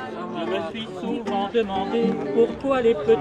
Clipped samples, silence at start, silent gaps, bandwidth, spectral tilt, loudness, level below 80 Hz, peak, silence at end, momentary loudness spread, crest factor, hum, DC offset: under 0.1%; 0 s; none; 8.8 kHz; -6.5 dB/octave; -24 LUFS; -52 dBFS; -8 dBFS; 0 s; 9 LU; 16 dB; none; under 0.1%